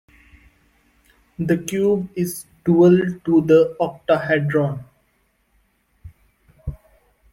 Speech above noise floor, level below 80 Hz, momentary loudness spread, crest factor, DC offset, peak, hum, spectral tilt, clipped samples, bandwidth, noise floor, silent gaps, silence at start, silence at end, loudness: 47 dB; -48 dBFS; 20 LU; 18 dB; under 0.1%; -4 dBFS; none; -7 dB/octave; under 0.1%; 16.5 kHz; -65 dBFS; none; 1.4 s; 0.6 s; -19 LUFS